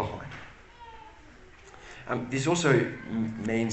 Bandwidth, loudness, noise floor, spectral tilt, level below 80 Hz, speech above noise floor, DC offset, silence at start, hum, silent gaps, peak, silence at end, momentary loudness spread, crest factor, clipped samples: 8.8 kHz; -28 LUFS; -51 dBFS; -5.5 dB/octave; -56 dBFS; 24 dB; under 0.1%; 0 s; none; none; -10 dBFS; 0 s; 25 LU; 22 dB; under 0.1%